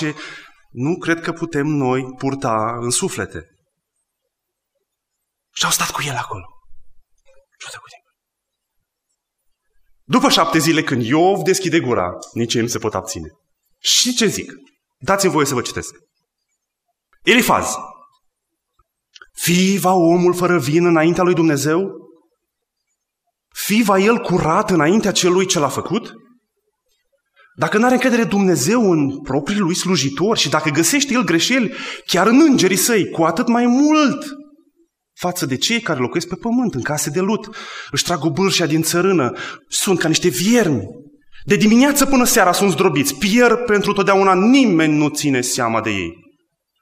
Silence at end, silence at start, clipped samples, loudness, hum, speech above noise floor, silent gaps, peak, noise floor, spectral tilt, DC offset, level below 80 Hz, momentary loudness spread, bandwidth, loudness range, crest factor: 0.65 s; 0 s; under 0.1%; -16 LUFS; none; 63 dB; none; 0 dBFS; -79 dBFS; -4 dB/octave; under 0.1%; -48 dBFS; 13 LU; 16 kHz; 9 LU; 18 dB